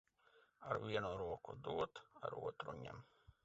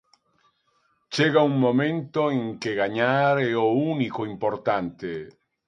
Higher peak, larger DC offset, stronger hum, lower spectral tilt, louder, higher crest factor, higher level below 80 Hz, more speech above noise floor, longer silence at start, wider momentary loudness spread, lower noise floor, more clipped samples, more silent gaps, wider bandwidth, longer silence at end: second, -26 dBFS vs -6 dBFS; neither; neither; second, -4 dB/octave vs -6.5 dB/octave; second, -46 LUFS vs -24 LUFS; about the same, 22 dB vs 18 dB; about the same, -70 dBFS vs -66 dBFS; second, 28 dB vs 45 dB; second, 0.35 s vs 1.1 s; about the same, 11 LU vs 11 LU; first, -74 dBFS vs -68 dBFS; neither; neither; second, 7.6 kHz vs 11 kHz; second, 0.15 s vs 0.4 s